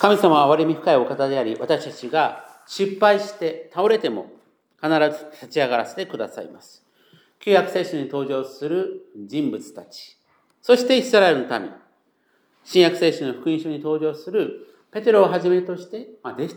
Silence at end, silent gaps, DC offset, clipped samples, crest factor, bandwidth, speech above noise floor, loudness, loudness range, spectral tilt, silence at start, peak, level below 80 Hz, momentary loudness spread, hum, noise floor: 0 s; none; under 0.1%; under 0.1%; 20 dB; over 20 kHz; 44 dB; -21 LUFS; 5 LU; -5 dB/octave; 0 s; 0 dBFS; -82 dBFS; 18 LU; none; -65 dBFS